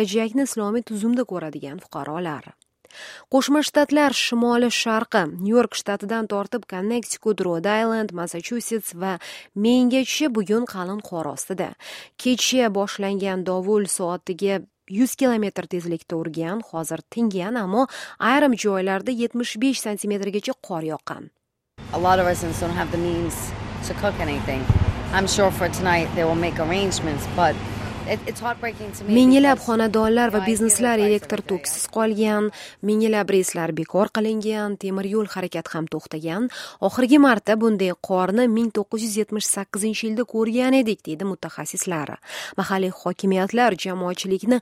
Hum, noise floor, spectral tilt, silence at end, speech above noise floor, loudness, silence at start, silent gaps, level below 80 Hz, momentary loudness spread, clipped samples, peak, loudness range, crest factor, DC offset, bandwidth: none; -44 dBFS; -4.5 dB/octave; 0 s; 22 dB; -22 LUFS; 0 s; none; -44 dBFS; 11 LU; under 0.1%; -4 dBFS; 5 LU; 18 dB; under 0.1%; 16 kHz